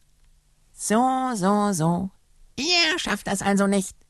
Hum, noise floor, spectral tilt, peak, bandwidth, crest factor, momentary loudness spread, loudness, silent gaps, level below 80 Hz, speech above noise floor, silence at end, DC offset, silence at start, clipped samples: none; -58 dBFS; -4 dB/octave; -6 dBFS; 13 kHz; 18 dB; 10 LU; -22 LUFS; none; -54 dBFS; 36 dB; 0.15 s; under 0.1%; 0.8 s; under 0.1%